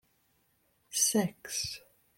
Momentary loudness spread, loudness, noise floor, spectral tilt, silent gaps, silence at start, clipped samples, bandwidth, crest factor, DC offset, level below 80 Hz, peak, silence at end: 11 LU; -31 LUFS; -73 dBFS; -2.5 dB/octave; none; 0.9 s; under 0.1%; 16.5 kHz; 22 dB; under 0.1%; -68 dBFS; -12 dBFS; 0.4 s